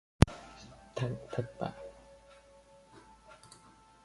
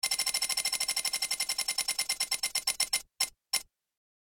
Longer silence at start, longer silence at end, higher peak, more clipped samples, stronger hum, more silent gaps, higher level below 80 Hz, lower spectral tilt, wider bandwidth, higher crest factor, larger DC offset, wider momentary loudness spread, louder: first, 0.25 s vs 0.05 s; first, 2.15 s vs 0.6 s; first, -4 dBFS vs -12 dBFS; neither; neither; neither; first, -44 dBFS vs -66 dBFS; first, -6.5 dB/octave vs 3 dB/octave; second, 11.5 kHz vs over 20 kHz; first, 34 dB vs 22 dB; neither; first, 29 LU vs 5 LU; second, -34 LUFS vs -29 LUFS